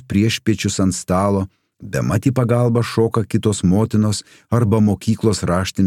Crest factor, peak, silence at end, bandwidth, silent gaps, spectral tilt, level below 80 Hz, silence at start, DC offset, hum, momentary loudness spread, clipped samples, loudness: 14 dB; -2 dBFS; 0 s; 15 kHz; none; -6 dB/octave; -48 dBFS; 0.1 s; under 0.1%; none; 5 LU; under 0.1%; -18 LUFS